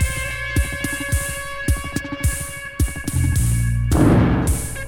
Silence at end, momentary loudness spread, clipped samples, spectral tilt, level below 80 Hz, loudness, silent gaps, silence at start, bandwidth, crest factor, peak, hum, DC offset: 0 s; 9 LU; under 0.1%; -5.5 dB/octave; -24 dBFS; -21 LUFS; none; 0 s; 18 kHz; 16 dB; -2 dBFS; none; under 0.1%